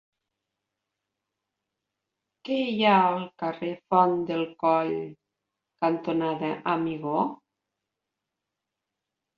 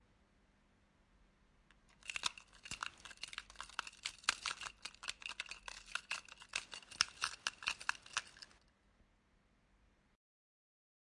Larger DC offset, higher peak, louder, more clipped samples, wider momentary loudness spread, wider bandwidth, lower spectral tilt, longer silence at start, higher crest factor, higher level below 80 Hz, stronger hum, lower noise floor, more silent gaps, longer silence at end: neither; first, -6 dBFS vs -12 dBFS; first, -26 LUFS vs -43 LUFS; neither; about the same, 11 LU vs 12 LU; second, 6.8 kHz vs 11.5 kHz; first, -8 dB/octave vs 1 dB/octave; first, 2.45 s vs 1.9 s; second, 22 dB vs 36 dB; about the same, -74 dBFS vs -72 dBFS; neither; first, -86 dBFS vs -74 dBFS; neither; second, 2.05 s vs 2.6 s